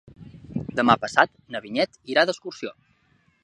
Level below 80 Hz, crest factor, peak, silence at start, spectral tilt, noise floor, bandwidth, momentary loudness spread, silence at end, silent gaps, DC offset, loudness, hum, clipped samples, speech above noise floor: -58 dBFS; 24 dB; -2 dBFS; 0.2 s; -4.5 dB/octave; -64 dBFS; 11 kHz; 16 LU; 0.7 s; none; under 0.1%; -23 LUFS; none; under 0.1%; 41 dB